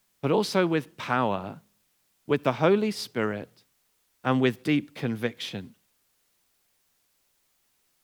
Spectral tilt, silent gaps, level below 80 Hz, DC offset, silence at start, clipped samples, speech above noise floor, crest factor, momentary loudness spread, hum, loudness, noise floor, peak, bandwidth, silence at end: -6 dB/octave; none; -80 dBFS; under 0.1%; 0.25 s; under 0.1%; 44 dB; 22 dB; 15 LU; none; -27 LUFS; -70 dBFS; -8 dBFS; over 20 kHz; 2.35 s